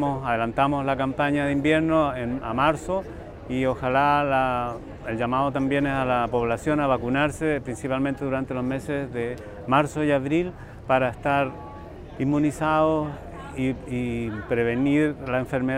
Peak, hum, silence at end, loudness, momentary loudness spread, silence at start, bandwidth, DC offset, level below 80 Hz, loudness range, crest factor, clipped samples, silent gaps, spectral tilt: -6 dBFS; none; 0 s; -24 LUFS; 10 LU; 0 s; 13.5 kHz; under 0.1%; -46 dBFS; 2 LU; 18 dB; under 0.1%; none; -7 dB/octave